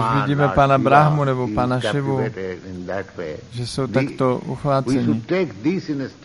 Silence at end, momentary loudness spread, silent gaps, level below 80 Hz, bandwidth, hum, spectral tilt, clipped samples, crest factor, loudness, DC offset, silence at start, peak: 0 s; 15 LU; none; -46 dBFS; 11.5 kHz; none; -7 dB/octave; under 0.1%; 18 dB; -20 LUFS; under 0.1%; 0 s; 0 dBFS